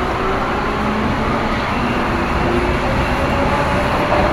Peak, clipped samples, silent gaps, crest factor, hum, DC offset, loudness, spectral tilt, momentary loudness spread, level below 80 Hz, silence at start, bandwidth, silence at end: -2 dBFS; under 0.1%; none; 14 dB; none; under 0.1%; -17 LUFS; -6 dB/octave; 2 LU; -26 dBFS; 0 s; 15.5 kHz; 0 s